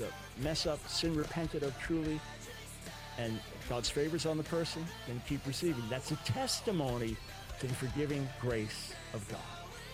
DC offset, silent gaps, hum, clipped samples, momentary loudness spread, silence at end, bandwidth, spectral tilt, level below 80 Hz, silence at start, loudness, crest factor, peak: under 0.1%; none; none; under 0.1%; 11 LU; 0 s; 16 kHz; -4.5 dB/octave; -52 dBFS; 0 s; -38 LUFS; 16 dB; -22 dBFS